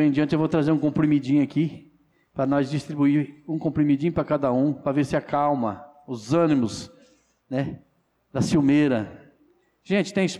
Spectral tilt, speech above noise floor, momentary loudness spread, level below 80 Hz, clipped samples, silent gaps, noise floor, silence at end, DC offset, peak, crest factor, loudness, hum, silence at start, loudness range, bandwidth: -7 dB/octave; 44 dB; 13 LU; -56 dBFS; under 0.1%; none; -66 dBFS; 0 s; under 0.1%; -12 dBFS; 12 dB; -23 LUFS; none; 0 s; 3 LU; 11 kHz